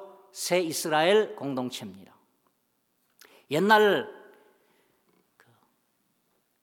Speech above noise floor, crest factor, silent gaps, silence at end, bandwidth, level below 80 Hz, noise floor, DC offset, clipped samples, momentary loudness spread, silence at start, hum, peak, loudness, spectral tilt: 49 dB; 22 dB; none; 2.45 s; 18.5 kHz; -86 dBFS; -74 dBFS; under 0.1%; under 0.1%; 20 LU; 0 s; none; -8 dBFS; -25 LUFS; -3.5 dB/octave